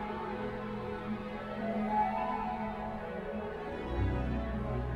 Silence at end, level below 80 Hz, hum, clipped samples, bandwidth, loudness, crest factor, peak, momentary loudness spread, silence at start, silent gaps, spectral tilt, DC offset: 0 s; -44 dBFS; none; under 0.1%; 8.6 kHz; -36 LUFS; 16 dB; -20 dBFS; 8 LU; 0 s; none; -8.5 dB/octave; under 0.1%